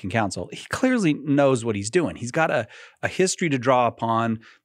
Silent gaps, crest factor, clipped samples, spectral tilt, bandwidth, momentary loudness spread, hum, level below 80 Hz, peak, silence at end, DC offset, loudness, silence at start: none; 18 dB; under 0.1%; -5 dB/octave; 14 kHz; 9 LU; none; -60 dBFS; -4 dBFS; 0.25 s; under 0.1%; -23 LUFS; 0.05 s